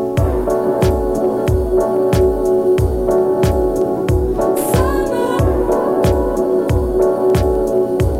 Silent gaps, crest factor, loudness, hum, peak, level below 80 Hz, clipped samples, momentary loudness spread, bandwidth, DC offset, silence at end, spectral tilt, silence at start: none; 12 dB; -15 LUFS; none; -2 dBFS; -24 dBFS; under 0.1%; 3 LU; 16 kHz; under 0.1%; 0 s; -7.5 dB/octave; 0 s